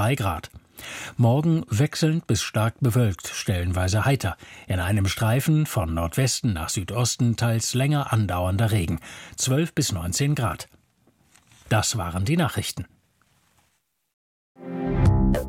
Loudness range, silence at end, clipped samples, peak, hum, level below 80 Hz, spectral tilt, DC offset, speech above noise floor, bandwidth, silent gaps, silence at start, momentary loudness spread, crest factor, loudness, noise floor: 5 LU; 0 s; under 0.1%; -6 dBFS; none; -38 dBFS; -5 dB/octave; under 0.1%; 47 dB; 16.5 kHz; 14.13-14.55 s; 0 s; 12 LU; 18 dB; -24 LUFS; -70 dBFS